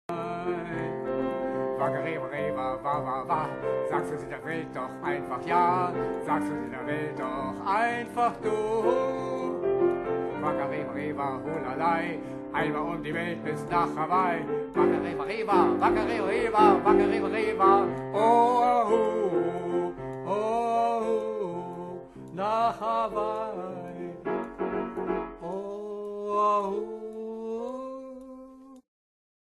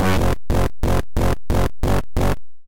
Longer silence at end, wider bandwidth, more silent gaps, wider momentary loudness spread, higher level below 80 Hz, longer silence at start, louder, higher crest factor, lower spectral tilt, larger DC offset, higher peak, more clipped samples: first, 0.65 s vs 0 s; second, 12 kHz vs 17 kHz; neither; first, 13 LU vs 2 LU; second, -58 dBFS vs -24 dBFS; about the same, 0.1 s vs 0 s; second, -28 LUFS vs -22 LUFS; first, 20 dB vs 8 dB; about the same, -7 dB/octave vs -6.5 dB/octave; neither; about the same, -8 dBFS vs -8 dBFS; neither